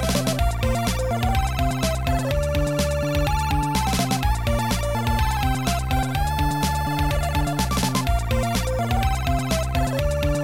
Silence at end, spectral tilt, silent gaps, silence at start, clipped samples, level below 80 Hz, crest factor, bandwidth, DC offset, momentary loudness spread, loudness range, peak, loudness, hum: 0 s; -5 dB/octave; none; 0 s; under 0.1%; -26 dBFS; 12 dB; 17 kHz; 0.8%; 1 LU; 0 LU; -10 dBFS; -23 LUFS; none